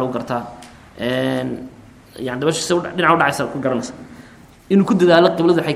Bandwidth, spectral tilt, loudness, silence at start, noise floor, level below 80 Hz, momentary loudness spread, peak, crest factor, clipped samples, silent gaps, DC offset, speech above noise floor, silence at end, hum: 14.5 kHz; -5.5 dB/octave; -17 LUFS; 0 s; -44 dBFS; -52 dBFS; 18 LU; 0 dBFS; 18 dB; under 0.1%; none; under 0.1%; 26 dB; 0 s; none